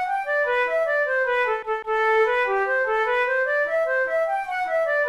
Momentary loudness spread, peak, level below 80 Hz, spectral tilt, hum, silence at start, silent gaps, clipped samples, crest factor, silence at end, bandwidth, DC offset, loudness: 4 LU; -12 dBFS; -58 dBFS; -2.5 dB/octave; none; 0 s; none; under 0.1%; 10 dB; 0 s; 12.5 kHz; under 0.1%; -22 LUFS